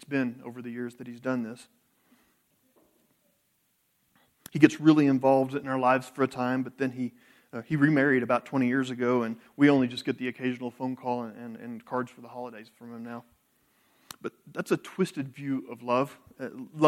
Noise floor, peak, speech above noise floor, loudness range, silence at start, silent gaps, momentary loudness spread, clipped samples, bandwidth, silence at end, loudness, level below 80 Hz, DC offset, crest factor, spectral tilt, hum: -72 dBFS; -4 dBFS; 45 dB; 14 LU; 0 s; none; 19 LU; under 0.1%; 14 kHz; 0 s; -27 LUFS; -76 dBFS; under 0.1%; 26 dB; -7 dB/octave; none